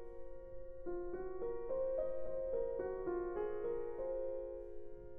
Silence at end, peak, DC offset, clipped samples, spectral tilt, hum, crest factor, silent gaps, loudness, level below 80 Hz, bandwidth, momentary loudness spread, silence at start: 0 s; -28 dBFS; under 0.1%; under 0.1%; -8 dB/octave; none; 12 dB; none; -42 LUFS; -56 dBFS; 3.4 kHz; 14 LU; 0 s